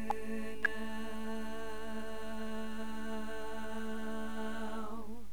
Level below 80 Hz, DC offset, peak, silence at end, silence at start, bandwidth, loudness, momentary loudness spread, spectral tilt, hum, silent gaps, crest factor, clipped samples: -56 dBFS; 2%; -18 dBFS; 0 s; 0 s; over 20 kHz; -41 LUFS; 7 LU; -5 dB/octave; 50 Hz at -55 dBFS; none; 22 dB; under 0.1%